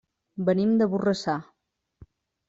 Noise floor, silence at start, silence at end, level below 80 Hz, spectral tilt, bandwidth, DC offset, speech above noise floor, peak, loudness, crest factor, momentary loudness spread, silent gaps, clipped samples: -55 dBFS; 0.35 s; 1.05 s; -64 dBFS; -7 dB/octave; 7.8 kHz; under 0.1%; 31 dB; -10 dBFS; -25 LUFS; 16 dB; 10 LU; none; under 0.1%